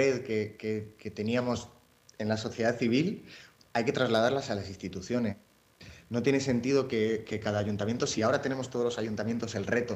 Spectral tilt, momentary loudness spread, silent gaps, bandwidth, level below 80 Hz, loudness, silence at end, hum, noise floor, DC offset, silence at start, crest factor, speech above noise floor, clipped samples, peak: -5.5 dB/octave; 10 LU; none; 15 kHz; -64 dBFS; -31 LUFS; 0 s; none; -54 dBFS; under 0.1%; 0 s; 16 dB; 24 dB; under 0.1%; -14 dBFS